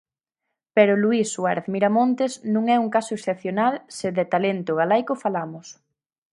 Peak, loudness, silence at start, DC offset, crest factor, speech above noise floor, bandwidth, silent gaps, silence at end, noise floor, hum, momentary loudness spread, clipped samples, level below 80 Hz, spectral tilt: -2 dBFS; -22 LUFS; 0.75 s; under 0.1%; 20 dB; 60 dB; 11.5 kHz; none; 0.6 s; -82 dBFS; none; 8 LU; under 0.1%; -72 dBFS; -5.5 dB/octave